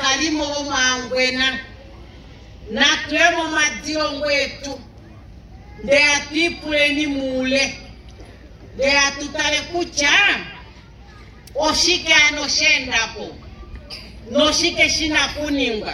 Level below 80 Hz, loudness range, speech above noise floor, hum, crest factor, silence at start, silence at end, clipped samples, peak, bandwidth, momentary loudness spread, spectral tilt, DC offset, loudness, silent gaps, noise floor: -42 dBFS; 3 LU; 23 dB; none; 18 dB; 0 s; 0 s; under 0.1%; -2 dBFS; 14 kHz; 18 LU; -1.5 dB/octave; under 0.1%; -17 LUFS; none; -42 dBFS